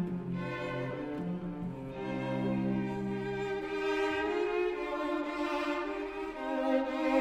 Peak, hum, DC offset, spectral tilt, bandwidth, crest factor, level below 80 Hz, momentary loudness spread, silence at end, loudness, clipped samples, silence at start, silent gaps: -16 dBFS; none; under 0.1%; -7 dB/octave; 12.5 kHz; 16 dB; -58 dBFS; 7 LU; 0 s; -34 LUFS; under 0.1%; 0 s; none